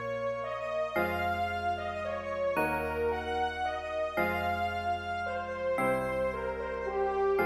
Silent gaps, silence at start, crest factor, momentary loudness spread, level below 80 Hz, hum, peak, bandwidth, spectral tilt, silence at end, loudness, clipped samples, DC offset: none; 0 s; 16 dB; 5 LU; -52 dBFS; none; -16 dBFS; 16 kHz; -6 dB/octave; 0 s; -32 LUFS; under 0.1%; under 0.1%